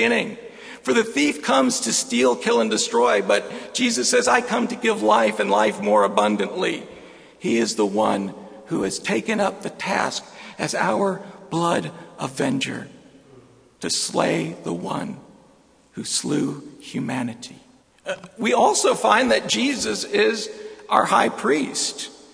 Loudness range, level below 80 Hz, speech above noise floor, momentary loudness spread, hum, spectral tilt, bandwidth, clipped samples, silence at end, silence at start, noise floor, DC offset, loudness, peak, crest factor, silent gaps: 7 LU; -64 dBFS; 34 dB; 15 LU; none; -3 dB/octave; 11 kHz; under 0.1%; 0.15 s; 0 s; -55 dBFS; under 0.1%; -21 LUFS; 0 dBFS; 22 dB; none